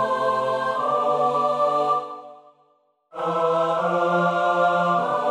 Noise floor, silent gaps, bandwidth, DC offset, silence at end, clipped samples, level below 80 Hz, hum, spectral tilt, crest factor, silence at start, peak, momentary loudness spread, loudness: -64 dBFS; none; 11.5 kHz; under 0.1%; 0 s; under 0.1%; -70 dBFS; none; -6 dB/octave; 14 dB; 0 s; -8 dBFS; 6 LU; -22 LUFS